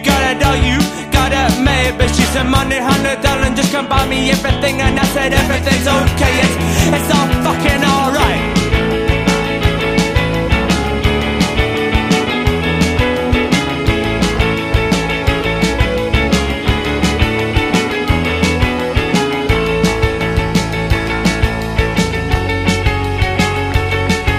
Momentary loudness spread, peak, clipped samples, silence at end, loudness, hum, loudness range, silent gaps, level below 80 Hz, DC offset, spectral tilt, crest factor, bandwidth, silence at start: 3 LU; 0 dBFS; under 0.1%; 0 s; -14 LUFS; none; 2 LU; none; -22 dBFS; 0.1%; -5 dB/octave; 14 dB; 15.5 kHz; 0 s